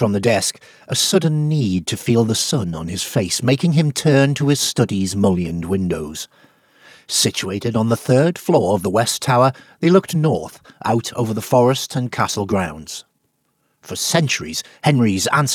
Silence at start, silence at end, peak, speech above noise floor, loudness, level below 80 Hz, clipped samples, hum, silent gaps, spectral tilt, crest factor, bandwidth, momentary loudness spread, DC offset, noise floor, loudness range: 0 s; 0 s; 0 dBFS; 49 dB; -18 LUFS; -50 dBFS; under 0.1%; none; none; -5 dB/octave; 18 dB; 19 kHz; 9 LU; under 0.1%; -67 dBFS; 4 LU